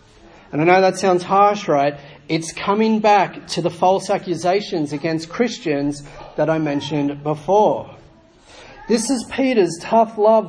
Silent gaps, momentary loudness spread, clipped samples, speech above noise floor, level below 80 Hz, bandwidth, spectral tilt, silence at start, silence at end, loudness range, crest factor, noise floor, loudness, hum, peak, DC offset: none; 10 LU; under 0.1%; 30 dB; -54 dBFS; 10.5 kHz; -5 dB/octave; 0.55 s; 0 s; 4 LU; 18 dB; -48 dBFS; -18 LUFS; none; 0 dBFS; under 0.1%